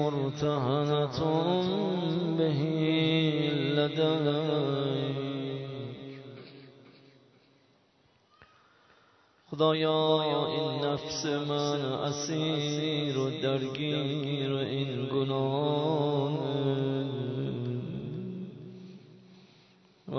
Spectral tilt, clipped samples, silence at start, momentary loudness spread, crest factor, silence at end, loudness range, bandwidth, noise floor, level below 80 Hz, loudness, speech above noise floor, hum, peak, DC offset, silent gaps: -6 dB/octave; under 0.1%; 0 s; 13 LU; 18 dB; 0 s; 8 LU; 6.4 kHz; -67 dBFS; -68 dBFS; -30 LUFS; 38 dB; none; -12 dBFS; under 0.1%; none